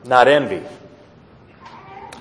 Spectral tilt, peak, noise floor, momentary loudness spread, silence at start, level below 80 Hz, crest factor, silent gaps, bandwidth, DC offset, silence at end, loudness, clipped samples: -5 dB/octave; 0 dBFS; -47 dBFS; 25 LU; 0.05 s; -60 dBFS; 20 dB; none; 11 kHz; under 0.1%; 0.15 s; -16 LUFS; under 0.1%